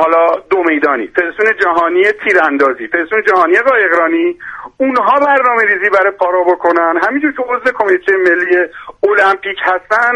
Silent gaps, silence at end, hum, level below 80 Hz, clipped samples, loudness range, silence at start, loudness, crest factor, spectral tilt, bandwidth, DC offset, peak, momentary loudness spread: none; 0 s; none; -54 dBFS; under 0.1%; 1 LU; 0 s; -11 LUFS; 12 dB; -4.5 dB/octave; 9.4 kHz; under 0.1%; 0 dBFS; 6 LU